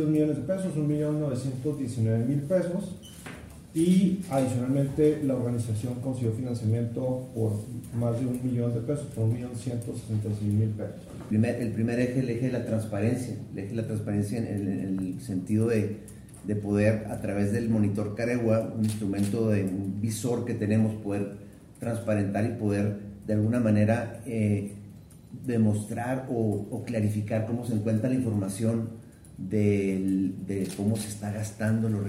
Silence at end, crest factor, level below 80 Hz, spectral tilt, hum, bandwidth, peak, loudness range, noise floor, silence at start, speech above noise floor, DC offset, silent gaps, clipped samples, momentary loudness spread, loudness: 0 s; 18 dB; -56 dBFS; -7.5 dB/octave; none; 15 kHz; -10 dBFS; 3 LU; -47 dBFS; 0 s; 20 dB; under 0.1%; none; under 0.1%; 9 LU; -28 LUFS